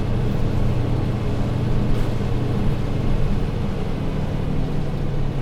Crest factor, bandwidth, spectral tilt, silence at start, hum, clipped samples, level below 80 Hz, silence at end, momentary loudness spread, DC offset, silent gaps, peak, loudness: 12 dB; 8.2 kHz; -8 dB/octave; 0 s; none; under 0.1%; -24 dBFS; 0 s; 3 LU; under 0.1%; none; -8 dBFS; -24 LUFS